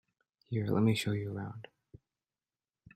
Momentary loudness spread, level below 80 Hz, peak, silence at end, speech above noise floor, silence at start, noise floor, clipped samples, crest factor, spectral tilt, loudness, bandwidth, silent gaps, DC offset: 19 LU; -68 dBFS; -16 dBFS; 1.35 s; over 58 dB; 0.5 s; under -90 dBFS; under 0.1%; 20 dB; -6.5 dB/octave; -33 LUFS; 14 kHz; none; under 0.1%